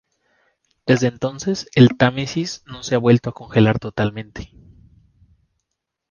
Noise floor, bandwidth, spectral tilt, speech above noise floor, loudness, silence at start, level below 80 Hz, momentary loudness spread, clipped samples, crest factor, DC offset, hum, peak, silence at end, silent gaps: -79 dBFS; 7.2 kHz; -6.5 dB/octave; 61 dB; -19 LUFS; 0.85 s; -48 dBFS; 17 LU; under 0.1%; 20 dB; under 0.1%; none; 0 dBFS; 1.65 s; none